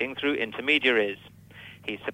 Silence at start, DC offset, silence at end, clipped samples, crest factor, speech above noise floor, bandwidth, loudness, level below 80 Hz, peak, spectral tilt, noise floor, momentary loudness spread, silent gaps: 0 s; under 0.1%; 0 s; under 0.1%; 20 dB; 21 dB; 16 kHz; -25 LUFS; -66 dBFS; -8 dBFS; -4.5 dB/octave; -48 dBFS; 22 LU; none